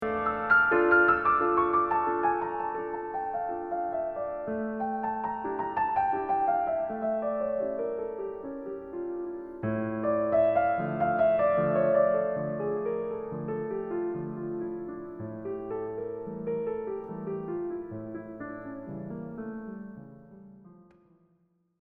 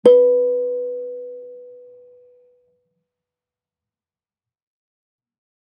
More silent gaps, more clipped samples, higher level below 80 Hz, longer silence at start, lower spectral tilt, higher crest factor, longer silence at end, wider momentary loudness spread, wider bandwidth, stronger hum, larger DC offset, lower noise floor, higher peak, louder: neither; neither; first, -60 dBFS vs -74 dBFS; about the same, 0 s vs 0.05 s; first, -10 dB/octave vs -6.5 dB/octave; about the same, 20 dB vs 20 dB; second, 1 s vs 3.95 s; second, 15 LU vs 25 LU; second, 4.5 kHz vs 9 kHz; neither; neither; second, -70 dBFS vs under -90 dBFS; second, -10 dBFS vs -2 dBFS; second, -29 LUFS vs -18 LUFS